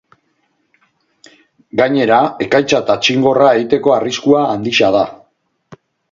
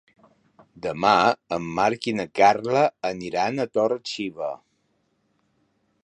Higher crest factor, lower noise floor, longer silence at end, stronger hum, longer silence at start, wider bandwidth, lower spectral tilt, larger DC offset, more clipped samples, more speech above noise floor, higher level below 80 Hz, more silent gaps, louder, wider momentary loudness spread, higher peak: second, 14 dB vs 22 dB; second, -63 dBFS vs -70 dBFS; second, 0.95 s vs 1.5 s; neither; first, 1.75 s vs 0.75 s; second, 7.6 kHz vs 10.5 kHz; about the same, -4.5 dB/octave vs -5 dB/octave; neither; neither; first, 51 dB vs 47 dB; first, -54 dBFS vs -62 dBFS; neither; first, -13 LUFS vs -23 LUFS; second, 4 LU vs 14 LU; first, 0 dBFS vs -4 dBFS